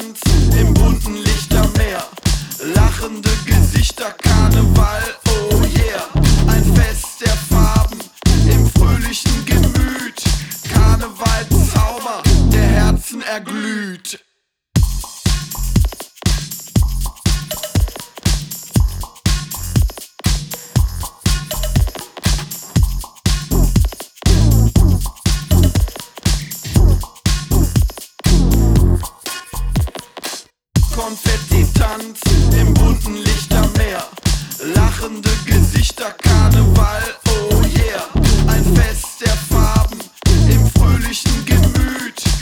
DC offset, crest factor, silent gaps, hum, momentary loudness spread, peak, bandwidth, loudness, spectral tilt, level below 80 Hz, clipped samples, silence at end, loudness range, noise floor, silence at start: under 0.1%; 12 dB; none; none; 9 LU; -2 dBFS; 18 kHz; -16 LUFS; -5 dB/octave; -18 dBFS; under 0.1%; 0 s; 5 LU; -67 dBFS; 0 s